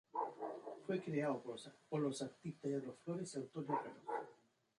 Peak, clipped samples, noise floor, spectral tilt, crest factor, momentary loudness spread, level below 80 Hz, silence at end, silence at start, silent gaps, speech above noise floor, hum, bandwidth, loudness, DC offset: -26 dBFS; under 0.1%; -69 dBFS; -6 dB/octave; 18 dB; 8 LU; -88 dBFS; 0.45 s; 0.15 s; none; 26 dB; none; 11 kHz; -45 LUFS; under 0.1%